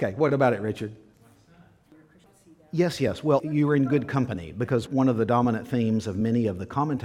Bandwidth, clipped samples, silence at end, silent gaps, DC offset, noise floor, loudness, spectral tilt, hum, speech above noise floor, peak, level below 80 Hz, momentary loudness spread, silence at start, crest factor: 14.5 kHz; under 0.1%; 0 s; none; under 0.1%; -56 dBFS; -25 LUFS; -7.5 dB/octave; none; 32 dB; -6 dBFS; -58 dBFS; 8 LU; 0 s; 18 dB